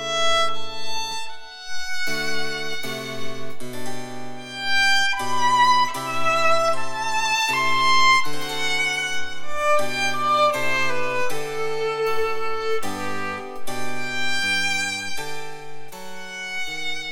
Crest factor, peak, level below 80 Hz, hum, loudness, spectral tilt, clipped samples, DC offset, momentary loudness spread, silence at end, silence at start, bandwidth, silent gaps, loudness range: 14 dB; -6 dBFS; -52 dBFS; none; -22 LUFS; -2 dB/octave; under 0.1%; under 0.1%; 16 LU; 0 s; 0 s; 19 kHz; none; 8 LU